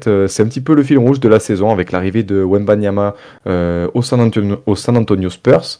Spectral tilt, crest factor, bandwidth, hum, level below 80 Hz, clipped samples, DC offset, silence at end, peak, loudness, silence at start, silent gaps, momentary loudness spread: -7 dB/octave; 12 dB; 11 kHz; none; -44 dBFS; 0.4%; under 0.1%; 0.05 s; 0 dBFS; -14 LUFS; 0 s; none; 6 LU